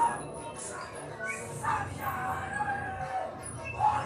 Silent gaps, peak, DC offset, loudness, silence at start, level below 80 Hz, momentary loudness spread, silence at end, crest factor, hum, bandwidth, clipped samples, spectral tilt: none; -16 dBFS; under 0.1%; -34 LUFS; 0 s; -56 dBFS; 9 LU; 0 s; 18 dB; none; 14 kHz; under 0.1%; -4 dB/octave